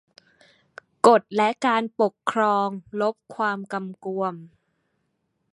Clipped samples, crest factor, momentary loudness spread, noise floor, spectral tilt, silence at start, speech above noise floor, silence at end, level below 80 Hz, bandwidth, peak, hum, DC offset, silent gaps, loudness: under 0.1%; 24 dB; 13 LU; -74 dBFS; -5 dB/octave; 1.05 s; 51 dB; 1.05 s; -72 dBFS; 11.5 kHz; -2 dBFS; none; under 0.1%; none; -23 LUFS